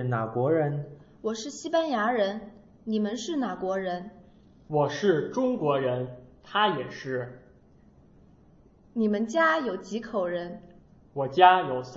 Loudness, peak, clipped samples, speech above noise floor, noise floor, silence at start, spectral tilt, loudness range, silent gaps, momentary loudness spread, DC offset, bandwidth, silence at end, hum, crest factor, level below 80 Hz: -27 LUFS; -2 dBFS; under 0.1%; 30 dB; -57 dBFS; 0 s; -5.5 dB/octave; 4 LU; none; 14 LU; under 0.1%; 8 kHz; 0 s; none; 24 dB; -64 dBFS